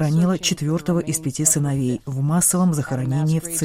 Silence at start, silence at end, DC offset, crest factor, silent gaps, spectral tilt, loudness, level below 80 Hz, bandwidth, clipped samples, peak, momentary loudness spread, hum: 0 s; 0 s; under 0.1%; 18 dB; none; -5 dB/octave; -20 LUFS; -50 dBFS; 16 kHz; under 0.1%; -2 dBFS; 6 LU; none